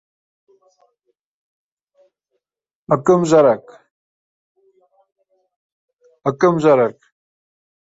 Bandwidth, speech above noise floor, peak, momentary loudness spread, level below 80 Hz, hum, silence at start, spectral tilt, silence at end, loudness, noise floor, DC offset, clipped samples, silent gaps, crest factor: 8 kHz; 75 dB; 0 dBFS; 11 LU; -62 dBFS; none; 2.9 s; -7 dB/octave; 0.9 s; -16 LUFS; -90 dBFS; under 0.1%; under 0.1%; 3.91-4.55 s, 5.56-5.88 s; 20 dB